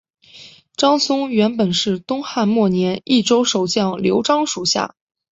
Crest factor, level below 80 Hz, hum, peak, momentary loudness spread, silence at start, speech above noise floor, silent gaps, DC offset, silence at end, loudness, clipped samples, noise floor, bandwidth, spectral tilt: 16 dB; -58 dBFS; none; -2 dBFS; 5 LU; 0.35 s; 26 dB; none; under 0.1%; 0.45 s; -17 LUFS; under 0.1%; -44 dBFS; 8 kHz; -4.5 dB/octave